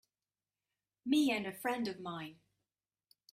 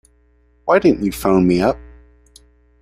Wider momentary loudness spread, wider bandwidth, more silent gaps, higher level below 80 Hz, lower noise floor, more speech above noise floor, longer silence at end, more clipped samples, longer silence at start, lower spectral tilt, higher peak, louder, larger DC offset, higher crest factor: first, 16 LU vs 11 LU; about the same, 15.5 kHz vs 15.5 kHz; neither; second, -80 dBFS vs -40 dBFS; first, under -90 dBFS vs -55 dBFS; first, over 55 dB vs 41 dB; about the same, 1 s vs 0.95 s; neither; first, 1.05 s vs 0.65 s; second, -4.5 dB/octave vs -7 dB/octave; second, -20 dBFS vs -2 dBFS; second, -36 LUFS vs -16 LUFS; neither; about the same, 18 dB vs 16 dB